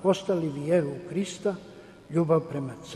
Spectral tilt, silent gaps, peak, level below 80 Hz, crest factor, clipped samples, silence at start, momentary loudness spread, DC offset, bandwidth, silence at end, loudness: -6.5 dB/octave; none; -10 dBFS; -64 dBFS; 18 dB; under 0.1%; 0 s; 10 LU; under 0.1%; 12 kHz; 0 s; -28 LUFS